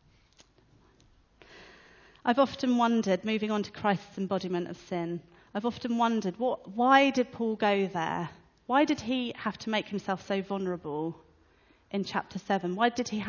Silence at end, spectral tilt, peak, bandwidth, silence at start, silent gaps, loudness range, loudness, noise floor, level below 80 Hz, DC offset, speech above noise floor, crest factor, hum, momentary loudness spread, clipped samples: 0 s; -5.5 dB/octave; -8 dBFS; 7.2 kHz; 1.5 s; none; 5 LU; -29 LUFS; -63 dBFS; -66 dBFS; under 0.1%; 34 dB; 22 dB; none; 9 LU; under 0.1%